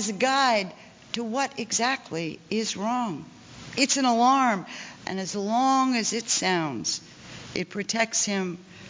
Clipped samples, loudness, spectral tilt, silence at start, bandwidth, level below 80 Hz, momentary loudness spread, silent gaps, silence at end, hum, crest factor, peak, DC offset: under 0.1%; -25 LUFS; -2.5 dB/octave; 0 s; 7.8 kHz; -66 dBFS; 14 LU; none; 0 s; none; 18 dB; -8 dBFS; under 0.1%